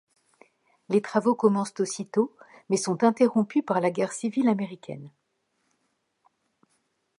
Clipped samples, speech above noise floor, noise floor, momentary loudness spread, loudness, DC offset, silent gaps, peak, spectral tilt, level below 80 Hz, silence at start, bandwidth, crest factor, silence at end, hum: under 0.1%; 50 dB; -75 dBFS; 9 LU; -25 LUFS; under 0.1%; none; -6 dBFS; -5.5 dB/octave; -78 dBFS; 0.9 s; 11.5 kHz; 20 dB; 2.1 s; none